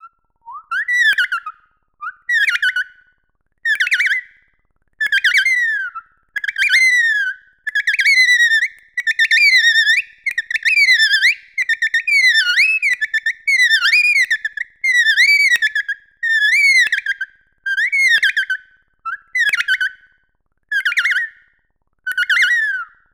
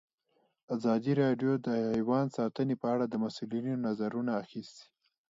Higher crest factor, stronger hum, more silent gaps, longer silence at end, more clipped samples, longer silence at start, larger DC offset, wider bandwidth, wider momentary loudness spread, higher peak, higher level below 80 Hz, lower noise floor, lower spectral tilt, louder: about the same, 16 dB vs 16 dB; neither; neither; second, 0.3 s vs 0.5 s; neither; second, 0.05 s vs 0.7 s; neither; first, over 20 kHz vs 7.8 kHz; first, 14 LU vs 8 LU; first, 0 dBFS vs -16 dBFS; first, -66 dBFS vs -74 dBFS; second, -65 dBFS vs -75 dBFS; second, 5 dB/octave vs -8 dB/octave; first, -13 LUFS vs -32 LUFS